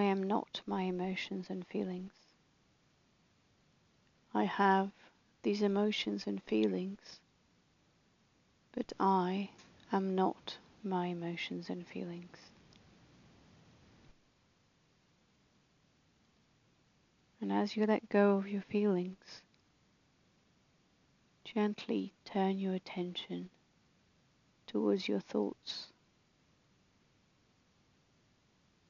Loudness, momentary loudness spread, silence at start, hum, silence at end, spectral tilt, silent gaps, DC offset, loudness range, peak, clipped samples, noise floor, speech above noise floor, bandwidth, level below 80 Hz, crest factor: -36 LUFS; 15 LU; 0 s; none; 3 s; -5 dB/octave; none; under 0.1%; 10 LU; -16 dBFS; under 0.1%; -72 dBFS; 37 dB; 7.2 kHz; -78 dBFS; 22 dB